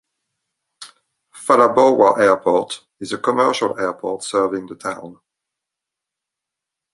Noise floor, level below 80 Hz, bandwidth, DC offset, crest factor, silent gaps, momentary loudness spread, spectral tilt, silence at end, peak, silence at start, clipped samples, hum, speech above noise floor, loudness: -84 dBFS; -64 dBFS; 11.5 kHz; under 0.1%; 18 dB; none; 16 LU; -4 dB/octave; 1.8 s; -2 dBFS; 0.8 s; under 0.1%; none; 67 dB; -17 LUFS